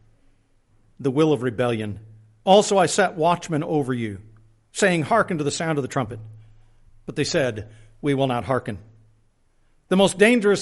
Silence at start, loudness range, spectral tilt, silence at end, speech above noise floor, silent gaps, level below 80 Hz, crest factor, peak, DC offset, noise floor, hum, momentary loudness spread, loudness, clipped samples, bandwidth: 1 s; 6 LU; -5 dB/octave; 0 s; 40 dB; none; -56 dBFS; 20 dB; -4 dBFS; under 0.1%; -61 dBFS; none; 17 LU; -21 LUFS; under 0.1%; 11.5 kHz